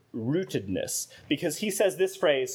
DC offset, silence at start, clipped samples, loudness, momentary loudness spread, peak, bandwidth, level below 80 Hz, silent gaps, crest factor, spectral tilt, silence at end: under 0.1%; 0.15 s; under 0.1%; -28 LUFS; 6 LU; -12 dBFS; 20 kHz; -68 dBFS; none; 16 dB; -4 dB/octave; 0 s